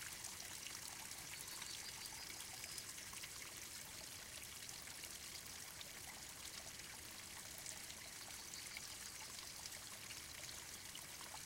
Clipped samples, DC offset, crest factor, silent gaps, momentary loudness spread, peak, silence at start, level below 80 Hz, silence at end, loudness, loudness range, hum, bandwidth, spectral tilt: under 0.1%; under 0.1%; 24 dB; none; 3 LU; -28 dBFS; 0 s; -72 dBFS; 0 s; -50 LUFS; 2 LU; none; 17 kHz; -0.5 dB/octave